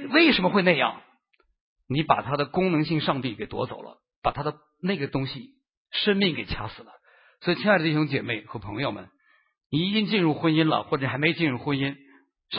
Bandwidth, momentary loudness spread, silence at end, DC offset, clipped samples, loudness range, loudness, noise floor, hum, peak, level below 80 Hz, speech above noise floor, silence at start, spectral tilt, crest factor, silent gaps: 5.6 kHz; 12 LU; 0 s; under 0.1%; under 0.1%; 3 LU; -25 LUFS; -68 dBFS; none; -4 dBFS; -54 dBFS; 43 dB; 0 s; -10.5 dB/octave; 22 dB; 1.61-1.76 s, 4.16-4.22 s, 5.77-5.85 s, 9.66-9.70 s